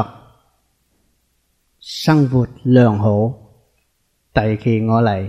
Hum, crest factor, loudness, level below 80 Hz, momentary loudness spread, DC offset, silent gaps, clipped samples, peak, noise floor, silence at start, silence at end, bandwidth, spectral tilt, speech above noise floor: none; 18 dB; -16 LUFS; -44 dBFS; 15 LU; under 0.1%; none; under 0.1%; 0 dBFS; -65 dBFS; 0 s; 0 s; 15 kHz; -8 dB/octave; 50 dB